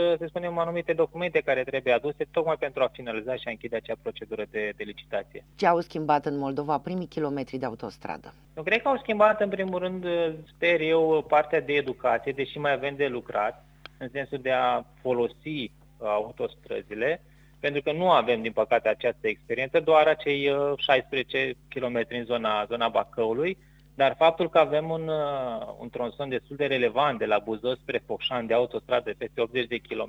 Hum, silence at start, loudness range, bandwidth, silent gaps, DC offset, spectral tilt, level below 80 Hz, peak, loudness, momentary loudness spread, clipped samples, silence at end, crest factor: none; 0 s; 5 LU; 7.8 kHz; none; under 0.1%; -6.5 dB/octave; -60 dBFS; -6 dBFS; -27 LUFS; 12 LU; under 0.1%; 0 s; 20 dB